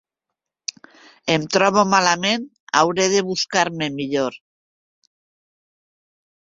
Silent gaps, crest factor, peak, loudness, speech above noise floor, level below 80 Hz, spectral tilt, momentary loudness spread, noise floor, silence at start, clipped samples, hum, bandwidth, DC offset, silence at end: 2.60-2.67 s; 22 dB; 0 dBFS; -19 LUFS; 65 dB; -62 dBFS; -3 dB/octave; 15 LU; -84 dBFS; 1.25 s; under 0.1%; none; 7.8 kHz; under 0.1%; 2.15 s